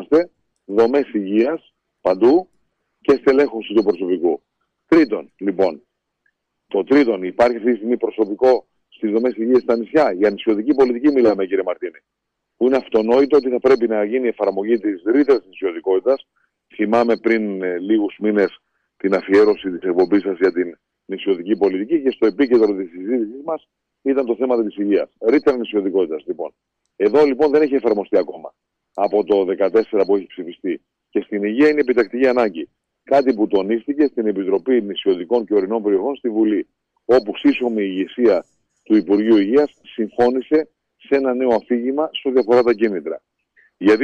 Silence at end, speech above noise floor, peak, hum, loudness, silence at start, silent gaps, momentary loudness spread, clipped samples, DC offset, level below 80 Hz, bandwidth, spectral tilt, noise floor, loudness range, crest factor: 0 s; 52 dB; -4 dBFS; none; -18 LUFS; 0 s; none; 11 LU; under 0.1%; under 0.1%; -60 dBFS; 7.2 kHz; -7 dB/octave; -69 dBFS; 2 LU; 14 dB